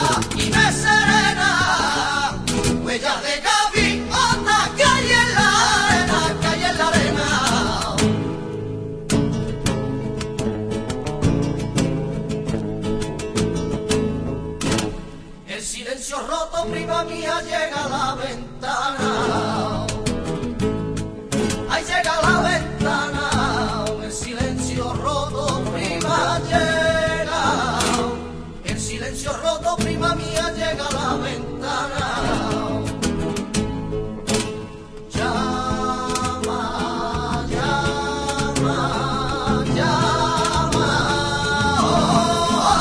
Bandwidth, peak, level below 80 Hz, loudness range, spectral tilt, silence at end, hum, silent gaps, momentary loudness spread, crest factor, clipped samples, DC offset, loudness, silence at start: 11 kHz; -2 dBFS; -36 dBFS; 8 LU; -4 dB/octave; 0 s; none; none; 10 LU; 18 dB; under 0.1%; under 0.1%; -20 LUFS; 0 s